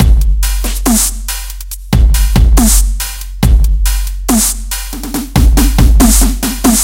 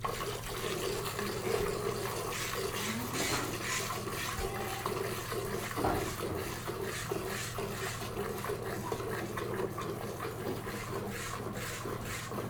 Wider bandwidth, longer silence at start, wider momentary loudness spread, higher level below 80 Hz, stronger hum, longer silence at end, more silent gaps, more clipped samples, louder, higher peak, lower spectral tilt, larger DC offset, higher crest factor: second, 17 kHz vs over 20 kHz; about the same, 0 s vs 0 s; first, 11 LU vs 5 LU; first, -10 dBFS vs -52 dBFS; neither; about the same, 0 s vs 0 s; neither; first, 0.7% vs under 0.1%; first, -12 LUFS vs -36 LUFS; first, 0 dBFS vs -18 dBFS; about the same, -4 dB/octave vs -4 dB/octave; neither; second, 10 dB vs 18 dB